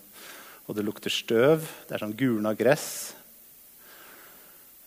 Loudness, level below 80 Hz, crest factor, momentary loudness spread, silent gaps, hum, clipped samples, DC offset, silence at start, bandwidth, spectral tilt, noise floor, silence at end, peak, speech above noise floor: -27 LUFS; -72 dBFS; 22 dB; 25 LU; none; none; under 0.1%; under 0.1%; 0.15 s; 16 kHz; -4.5 dB/octave; -52 dBFS; 0.6 s; -6 dBFS; 26 dB